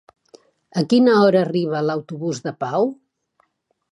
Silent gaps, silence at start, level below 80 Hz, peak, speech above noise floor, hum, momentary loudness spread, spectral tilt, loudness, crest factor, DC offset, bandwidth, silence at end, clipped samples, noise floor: none; 0.75 s; -70 dBFS; -4 dBFS; 48 dB; none; 12 LU; -6.5 dB/octave; -19 LUFS; 18 dB; under 0.1%; 11 kHz; 1 s; under 0.1%; -66 dBFS